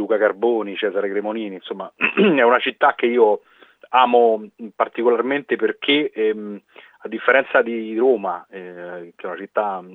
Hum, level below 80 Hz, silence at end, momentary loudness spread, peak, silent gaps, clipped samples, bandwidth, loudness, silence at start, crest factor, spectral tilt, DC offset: none; -82 dBFS; 0 s; 17 LU; -2 dBFS; none; under 0.1%; 4.1 kHz; -19 LUFS; 0 s; 18 dB; -7.5 dB/octave; under 0.1%